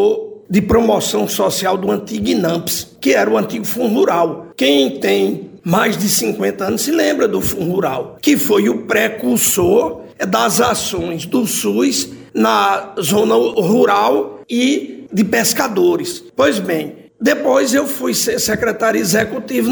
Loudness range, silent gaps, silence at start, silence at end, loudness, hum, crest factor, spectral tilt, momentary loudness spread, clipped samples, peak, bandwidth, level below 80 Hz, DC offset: 1 LU; none; 0 s; 0 s; -15 LUFS; none; 14 dB; -4 dB/octave; 7 LU; under 0.1%; -2 dBFS; over 20 kHz; -46 dBFS; under 0.1%